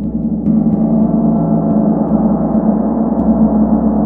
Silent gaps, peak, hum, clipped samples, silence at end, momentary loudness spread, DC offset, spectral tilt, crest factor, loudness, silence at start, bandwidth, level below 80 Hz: none; 0 dBFS; none; under 0.1%; 0 s; 3 LU; under 0.1%; -14.5 dB/octave; 12 dB; -13 LUFS; 0 s; 1.9 kHz; -30 dBFS